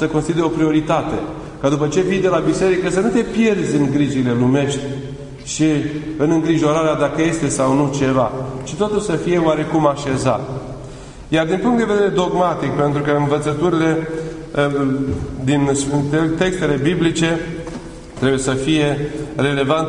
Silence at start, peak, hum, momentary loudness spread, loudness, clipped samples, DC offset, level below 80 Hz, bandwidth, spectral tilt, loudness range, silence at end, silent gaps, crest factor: 0 s; 0 dBFS; none; 10 LU; -18 LUFS; under 0.1%; under 0.1%; -40 dBFS; 11 kHz; -6 dB/octave; 2 LU; 0 s; none; 16 dB